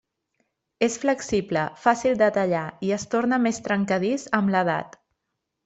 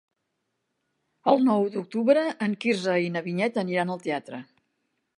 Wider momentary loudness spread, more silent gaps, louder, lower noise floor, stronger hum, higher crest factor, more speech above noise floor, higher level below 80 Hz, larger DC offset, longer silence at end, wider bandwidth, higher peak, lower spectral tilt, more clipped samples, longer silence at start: second, 6 LU vs 9 LU; neither; about the same, -24 LUFS vs -25 LUFS; about the same, -80 dBFS vs -79 dBFS; neither; about the same, 20 dB vs 20 dB; about the same, 57 dB vs 54 dB; first, -60 dBFS vs -78 dBFS; neither; about the same, 0.8 s vs 0.75 s; second, 8.2 kHz vs 11 kHz; first, -4 dBFS vs -8 dBFS; about the same, -5.5 dB/octave vs -6.5 dB/octave; neither; second, 0.8 s vs 1.25 s